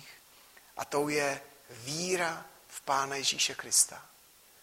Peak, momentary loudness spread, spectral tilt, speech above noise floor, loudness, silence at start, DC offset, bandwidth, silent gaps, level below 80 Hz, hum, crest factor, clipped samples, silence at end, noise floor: -10 dBFS; 21 LU; -1.5 dB/octave; 26 dB; -30 LUFS; 0 s; under 0.1%; 16 kHz; none; -74 dBFS; none; 24 dB; under 0.1%; 0.6 s; -58 dBFS